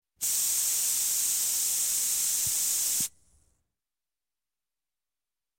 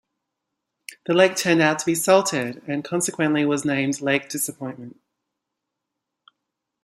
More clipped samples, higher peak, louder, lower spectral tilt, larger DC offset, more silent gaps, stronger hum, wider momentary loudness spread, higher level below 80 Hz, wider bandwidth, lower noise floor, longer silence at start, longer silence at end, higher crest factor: neither; second, -14 dBFS vs -2 dBFS; second, -25 LUFS vs -21 LUFS; second, 2 dB/octave vs -4 dB/octave; neither; neither; neither; second, 2 LU vs 16 LU; about the same, -70 dBFS vs -68 dBFS; first, 19.5 kHz vs 15 kHz; first, under -90 dBFS vs -82 dBFS; second, 0.2 s vs 1.1 s; first, 2.5 s vs 1.95 s; second, 16 dB vs 22 dB